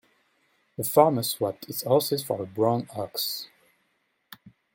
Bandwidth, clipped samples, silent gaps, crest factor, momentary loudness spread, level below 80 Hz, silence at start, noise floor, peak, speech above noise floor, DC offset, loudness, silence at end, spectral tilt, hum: 17 kHz; under 0.1%; none; 24 dB; 12 LU; -68 dBFS; 0.8 s; -73 dBFS; -4 dBFS; 47 dB; under 0.1%; -26 LUFS; 0.25 s; -5 dB/octave; none